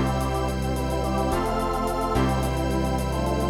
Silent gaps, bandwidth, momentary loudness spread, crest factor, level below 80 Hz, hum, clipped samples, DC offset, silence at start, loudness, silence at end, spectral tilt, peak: none; 16.5 kHz; 3 LU; 14 dB; -30 dBFS; none; under 0.1%; under 0.1%; 0 s; -25 LUFS; 0 s; -6 dB/octave; -10 dBFS